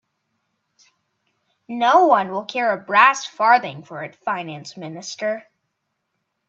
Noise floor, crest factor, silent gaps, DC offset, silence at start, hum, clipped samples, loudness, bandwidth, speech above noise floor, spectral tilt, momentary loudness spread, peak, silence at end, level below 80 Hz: -75 dBFS; 22 dB; none; under 0.1%; 1.7 s; none; under 0.1%; -18 LUFS; 7.8 kHz; 56 dB; -3.5 dB/octave; 19 LU; 0 dBFS; 1.1 s; -78 dBFS